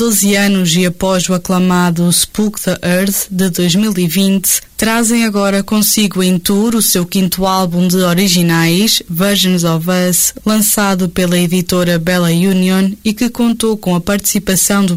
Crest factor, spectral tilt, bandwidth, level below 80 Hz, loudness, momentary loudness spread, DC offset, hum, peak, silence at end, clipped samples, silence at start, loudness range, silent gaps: 10 dB; -4 dB/octave; 16.5 kHz; -40 dBFS; -12 LUFS; 4 LU; under 0.1%; none; -2 dBFS; 0 s; under 0.1%; 0 s; 1 LU; none